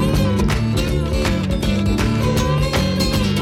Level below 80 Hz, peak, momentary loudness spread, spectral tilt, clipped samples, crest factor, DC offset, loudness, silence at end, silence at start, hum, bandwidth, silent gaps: -24 dBFS; -6 dBFS; 2 LU; -6 dB/octave; under 0.1%; 10 dB; under 0.1%; -18 LUFS; 0 s; 0 s; none; 16.5 kHz; none